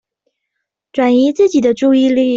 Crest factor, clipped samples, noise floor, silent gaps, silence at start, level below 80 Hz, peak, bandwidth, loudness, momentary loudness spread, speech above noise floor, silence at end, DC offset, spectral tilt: 10 dB; under 0.1%; -76 dBFS; none; 0.95 s; -56 dBFS; -2 dBFS; 7.6 kHz; -12 LUFS; 4 LU; 64 dB; 0 s; under 0.1%; -5 dB/octave